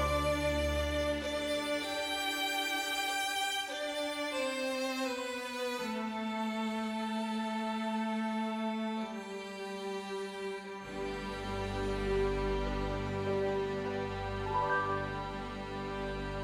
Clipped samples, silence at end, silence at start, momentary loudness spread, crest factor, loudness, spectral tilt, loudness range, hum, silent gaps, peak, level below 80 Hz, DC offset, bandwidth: under 0.1%; 0 s; 0 s; 7 LU; 16 dB; -35 LUFS; -4.5 dB/octave; 5 LU; none; none; -20 dBFS; -46 dBFS; under 0.1%; 20 kHz